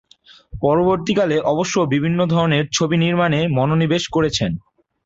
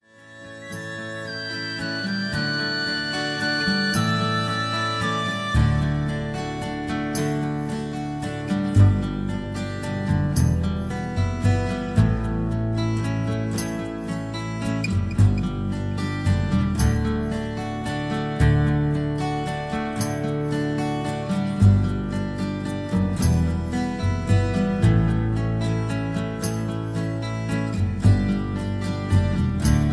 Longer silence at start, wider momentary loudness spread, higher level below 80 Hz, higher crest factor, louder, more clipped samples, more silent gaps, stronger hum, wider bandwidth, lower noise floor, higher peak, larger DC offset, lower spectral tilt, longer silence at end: first, 0.55 s vs 0.2 s; second, 4 LU vs 9 LU; second, -46 dBFS vs -34 dBFS; about the same, 14 dB vs 18 dB; first, -18 LUFS vs -24 LUFS; neither; neither; neither; second, 7.8 kHz vs 11 kHz; about the same, -46 dBFS vs -44 dBFS; about the same, -4 dBFS vs -6 dBFS; neither; about the same, -5.5 dB/octave vs -6.5 dB/octave; first, 0.45 s vs 0 s